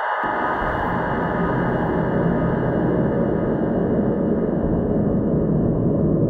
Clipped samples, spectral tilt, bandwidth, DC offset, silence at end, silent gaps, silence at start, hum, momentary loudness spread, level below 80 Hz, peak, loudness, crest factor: under 0.1%; -10.5 dB/octave; 4.6 kHz; under 0.1%; 0 s; none; 0 s; none; 2 LU; -36 dBFS; -8 dBFS; -21 LUFS; 12 dB